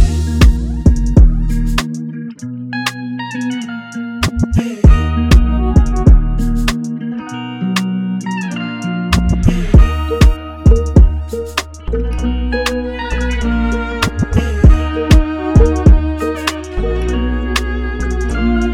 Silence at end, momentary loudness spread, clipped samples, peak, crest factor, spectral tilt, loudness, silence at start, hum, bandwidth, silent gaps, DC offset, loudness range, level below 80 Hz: 0 s; 11 LU; 0.6%; 0 dBFS; 12 dB; -6.5 dB/octave; -15 LUFS; 0 s; none; 14 kHz; none; under 0.1%; 4 LU; -14 dBFS